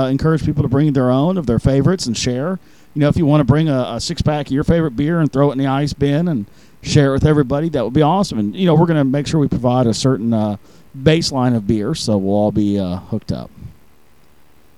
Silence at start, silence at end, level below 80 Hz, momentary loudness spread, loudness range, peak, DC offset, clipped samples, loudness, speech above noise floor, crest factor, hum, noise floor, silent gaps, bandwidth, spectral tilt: 0 s; 1.05 s; -36 dBFS; 9 LU; 3 LU; 0 dBFS; 0.6%; under 0.1%; -16 LUFS; 37 dB; 16 dB; none; -52 dBFS; none; 12 kHz; -6.5 dB/octave